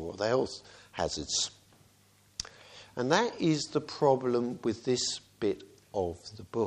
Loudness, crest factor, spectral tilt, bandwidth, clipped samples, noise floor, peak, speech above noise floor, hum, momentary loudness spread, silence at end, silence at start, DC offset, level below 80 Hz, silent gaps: -31 LUFS; 22 dB; -4 dB/octave; 12 kHz; under 0.1%; -64 dBFS; -10 dBFS; 33 dB; none; 16 LU; 0 s; 0 s; under 0.1%; -60 dBFS; none